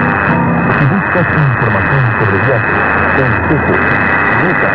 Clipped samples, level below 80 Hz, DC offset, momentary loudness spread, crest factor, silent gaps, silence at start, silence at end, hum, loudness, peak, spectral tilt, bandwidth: under 0.1%; -34 dBFS; under 0.1%; 1 LU; 10 dB; none; 0 s; 0 s; none; -11 LUFS; 0 dBFS; -10 dB/octave; 5.4 kHz